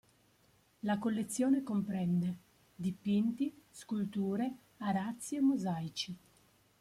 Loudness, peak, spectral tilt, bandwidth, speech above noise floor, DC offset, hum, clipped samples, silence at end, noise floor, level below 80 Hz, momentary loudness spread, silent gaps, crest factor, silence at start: -36 LUFS; -22 dBFS; -6 dB/octave; 15 kHz; 35 dB; under 0.1%; none; under 0.1%; 0.65 s; -69 dBFS; -74 dBFS; 10 LU; none; 14 dB; 0.85 s